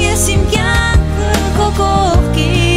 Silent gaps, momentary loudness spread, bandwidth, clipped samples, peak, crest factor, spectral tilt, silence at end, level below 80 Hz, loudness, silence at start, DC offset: none; 2 LU; 16 kHz; under 0.1%; 0 dBFS; 12 dB; -4.5 dB/octave; 0 s; -16 dBFS; -13 LUFS; 0 s; under 0.1%